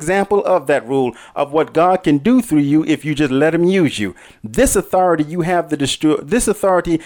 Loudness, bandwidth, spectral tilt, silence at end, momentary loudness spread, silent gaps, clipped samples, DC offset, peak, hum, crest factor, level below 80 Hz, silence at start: -16 LUFS; 18.5 kHz; -5 dB/octave; 0 s; 5 LU; none; under 0.1%; under 0.1%; -4 dBFS; none; 12 dB; -38 dBFS; 0 s